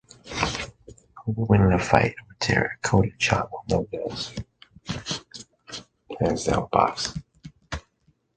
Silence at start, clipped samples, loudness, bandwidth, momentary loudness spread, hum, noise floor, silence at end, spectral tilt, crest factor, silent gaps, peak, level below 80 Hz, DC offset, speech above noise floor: 0.25 s; under 0.1%; -25 LUFS; 9.4 kHz; 19 LU; none; -66 dBFS; 0.55 s; -5 dB/octave; 26 dB; none; 0 dBFS; -42 dBFS; under 0.1%; 43 dB